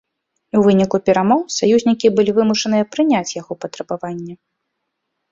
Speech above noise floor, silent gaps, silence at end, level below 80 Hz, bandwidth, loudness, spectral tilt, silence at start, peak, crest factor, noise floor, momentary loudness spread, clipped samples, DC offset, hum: 59 dB; none; 0.95 s; -56 dBFS; 7.8 kHz; -16 LUFS; -5.5 dB/octave; 0.55 s; -2 dBFS; 16 dB; -75 dBFS; 14 LU; under 0.1%; under 0.1%; none